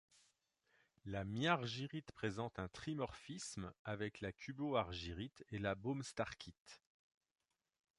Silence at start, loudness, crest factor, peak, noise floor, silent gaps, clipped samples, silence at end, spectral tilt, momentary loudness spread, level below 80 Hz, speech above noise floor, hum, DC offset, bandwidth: 1.05 s; -44 LUFS; 24 dB; -22 dBFS; -81 dBFS; 3.79-3.85 s, 6.60-6.66 s; under 0.1%; 1.2 s; -5 dB/octave; 11 LU; -66 dBFS; 37 dB; none; under 0.1%; 11 kHz